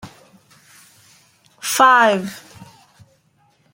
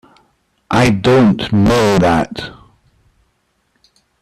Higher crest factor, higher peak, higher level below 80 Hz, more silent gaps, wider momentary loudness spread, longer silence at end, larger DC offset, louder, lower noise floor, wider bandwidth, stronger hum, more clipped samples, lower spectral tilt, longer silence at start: first, 20 dB vs 12 dB; about the same, -2 dBFS vs -2 dBFS; second, -66 dBFS vs -38 dBFS; neither; first, 21 LU vs 13 LU; second, 1.35 s vs 1.7 s; neither; about the same, -15 LUFS vs -13 LUFS; about the same, -60 dBFS vs -63 dBFS; first, 16.5 kHz vs 14 kHz; neither; neither; second, -2.5 dB/octave vs -6.5 dB/octave; second, 0.05 s vs 0.7 s